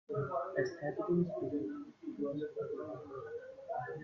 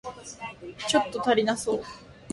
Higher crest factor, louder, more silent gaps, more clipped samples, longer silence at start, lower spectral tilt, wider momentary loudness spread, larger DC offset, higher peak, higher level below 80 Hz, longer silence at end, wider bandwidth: about the same, 18 dB vs 20 dB; second, -39 LUFS vs -26 LUFS; neither; neither; about the same, 0.1 s vs 0.05 s; first, -8.5 dB/octave vs -3 dB/octave; second, 12 LU vs 16 LU; neither; second, -20 dBFS vs -8 dBFS; second, -74 dBFS vs -58 dBFS; about the same, 0 s vs 0 s; second, 6.8 kHz vs 11.5 kHz